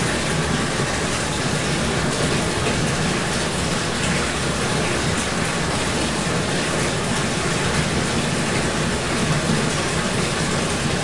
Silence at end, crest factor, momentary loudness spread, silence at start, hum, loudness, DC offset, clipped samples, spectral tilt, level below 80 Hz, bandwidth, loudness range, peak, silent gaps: 0 s; 16 dB; 1 LU; 0 s; none; -21 LUFS; 1%; under 0.1%; -4 dB/octave; -36 dBFS; 11.5 kHz; 0 LU; -6 dBFS; none